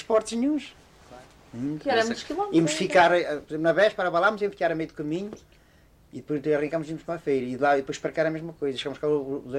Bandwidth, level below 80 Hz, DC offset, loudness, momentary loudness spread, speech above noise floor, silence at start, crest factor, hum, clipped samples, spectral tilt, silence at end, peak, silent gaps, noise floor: 13.5 kHz; -60 dBFS; under 0.1%; -26 LUFS; 11 LU; 32 dB; 0 s; 18 dB; none; under 0.1%; -5 dB/octave; 0 s; -8 dBFS; none; -57 dBFS